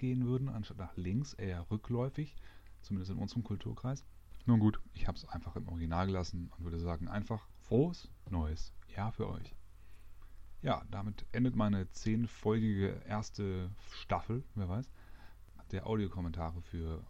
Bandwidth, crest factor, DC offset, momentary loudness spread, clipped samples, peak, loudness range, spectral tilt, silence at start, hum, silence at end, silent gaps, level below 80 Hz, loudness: 8.2 kHz; 20 dB; under 0.1%; 11 LU; under 0.1%; -18 dBFS; 5 LU; -7.5 dB/octave; 0 s; none; 0 s; none; -50 dBFS; -38 LUFS